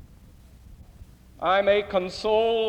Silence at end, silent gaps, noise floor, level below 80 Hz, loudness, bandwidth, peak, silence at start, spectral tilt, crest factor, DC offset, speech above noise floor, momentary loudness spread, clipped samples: 0 s; none; -50 dBFS; -50 dBFS; -23 LUFS; 9.6 kHz; -10 dBFS; 0 s; -4.5 dB/octave; 16 dB; under 0.1%; 27 dB; 7 LU; under 0.1%